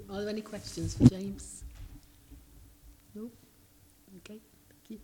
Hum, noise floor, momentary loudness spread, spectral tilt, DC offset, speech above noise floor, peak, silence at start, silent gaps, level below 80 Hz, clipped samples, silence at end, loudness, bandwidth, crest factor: none; -61 dBFS; 27 LU; -7 dB/octave; under 0.1%; 31 dB; -4 dBFS; 0 s; none; -50 dBFS; under 0.1%; 0 s; -29 LUFS; 18.5 kHz; 30 dB